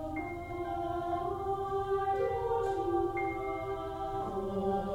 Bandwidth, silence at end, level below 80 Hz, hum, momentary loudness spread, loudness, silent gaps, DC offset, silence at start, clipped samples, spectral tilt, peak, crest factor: 16 kHz; 0 s; -50 dBFS; none; 6 LU; -34 LUFS; none; under 0.1%; 0 s; under 0.1%; -7.5 dB/octave; -20 dBFS; 14 dB